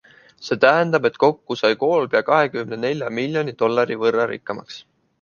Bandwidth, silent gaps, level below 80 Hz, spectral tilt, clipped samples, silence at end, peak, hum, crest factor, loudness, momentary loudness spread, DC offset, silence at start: 7 kHz; none; -66 dBFS; -6 dB/octave; under 0.1%; 0.4 s; -2 dBFS; none; 18 dB; -19 LUFS; 14 LU; under 0.1%; 0.4 s